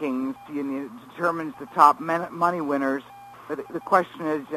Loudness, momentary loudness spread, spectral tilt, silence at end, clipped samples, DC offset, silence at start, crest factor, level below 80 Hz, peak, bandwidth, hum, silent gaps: -24 LUFS; 16 LU; -6 dB/octave; 0 s; under 0.1%; under 0.1%; 0 s; 24 dB; -68 dBFS; 0 dBFS; 15.5 kHz; none; none